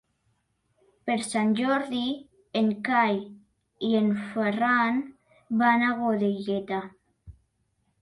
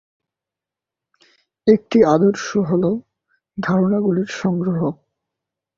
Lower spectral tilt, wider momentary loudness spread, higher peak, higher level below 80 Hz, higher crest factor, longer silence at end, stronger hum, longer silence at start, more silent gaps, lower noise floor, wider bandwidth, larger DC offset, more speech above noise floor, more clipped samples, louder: second, -5.5 dB/octave vs -7 dB/octave; about the same, 11 LU vs 10 LU; second, -10 dBFS vs -2 dBFS; second, -64 dBFS vs -58 dBFS; about the same, 18 dB vs 18 dB; second, 0.7 s vs 0.85 s; neither; second, 1.05 s vs 1.65 s; neither; second, -73 dBFS vs -87 dBFS; first, 11.5 kHz vs 7.6 kHz; neither; second, 48 dB vs 70 dB; neither; second, -26 LUFS vs -18 LUFS